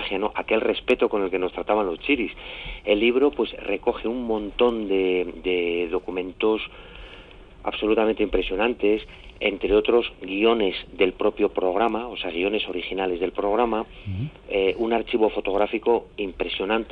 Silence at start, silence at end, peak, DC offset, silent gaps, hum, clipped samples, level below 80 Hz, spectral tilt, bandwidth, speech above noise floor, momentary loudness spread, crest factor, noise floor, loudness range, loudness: 0 s; 0 s; -6 dBFS; under 0.1%; none; none; under 0.1%; -46 dBFS; -7.5 dB/octave; 4.8 kHz; 21 dB; 10 LU; 18 dB; -45 dBFS; 3 LU; -24 LUFS